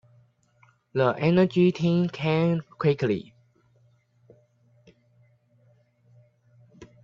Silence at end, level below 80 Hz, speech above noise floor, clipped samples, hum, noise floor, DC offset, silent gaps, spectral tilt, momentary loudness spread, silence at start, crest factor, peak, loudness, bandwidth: 0.2 s; -64 dBFS; 40 dB; under 0.1%; none; -63 dBFS; under 0.1%; none; -8.5 dB/octave; 6 LU; 0.95 s; 20 dB; -8 dBFS; -24 LUFS; 7 kHz